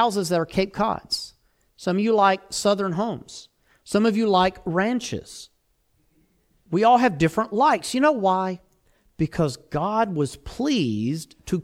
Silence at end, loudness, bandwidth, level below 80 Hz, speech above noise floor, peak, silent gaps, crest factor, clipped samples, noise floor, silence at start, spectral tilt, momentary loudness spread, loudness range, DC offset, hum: 0 s; -23 LUFS; 16 kHz; -52 dBFS; 45 dB; -6 dBFS; none; 18 dB; under 0.1%; -67 dBFS; 0 s; -5.5 dB/octave; 13 LU; 3 LU; under 0.1%; none